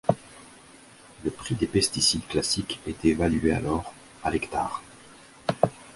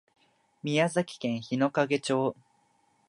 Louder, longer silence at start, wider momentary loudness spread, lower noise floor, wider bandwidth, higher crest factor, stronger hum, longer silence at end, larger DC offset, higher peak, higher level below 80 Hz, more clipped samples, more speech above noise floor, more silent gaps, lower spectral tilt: first, -26 LUFS vs -29 LUFS; second, 0.05 s vs 0.65 s; first, 12 LU vs 7 LU; second, -51 dBFS vs -68 dBFS; about the same, 11.5 kHz vs 11.5 kHz; about the same, 24 dB vs 20 dB; neither; second, 0 s vs 0.75 s; neither; first, -4 dBFS vs -12 dBFS; first, -46 dBFS vs -76 dBFS; neither; second, 25 dB vs 40 dB; neither; second, -4 dB/octave vs -5.5 dB/octave